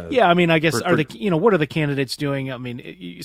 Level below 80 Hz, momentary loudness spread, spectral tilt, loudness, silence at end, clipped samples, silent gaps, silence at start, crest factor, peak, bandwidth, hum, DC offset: -54 dBFS; 15 LU; -6 dB/octave; -19 LUFS; 0 s; under 0.1%; none; 0 s; 20 dB; 0 dBFS; 16 kHz; none; under 0.1%